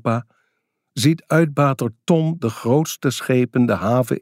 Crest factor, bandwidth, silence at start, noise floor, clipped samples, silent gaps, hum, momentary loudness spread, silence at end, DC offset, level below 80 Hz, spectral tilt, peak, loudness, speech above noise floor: 16 dB; 16 kHz; 0.05 s; -73 dBFS; under 0.1%; none; none; 6 LU; 0.05 s; under 0.1%; -62 dBFS; -6.5 dB/octave; -4 dBFS; -19 LUFS; 54 dB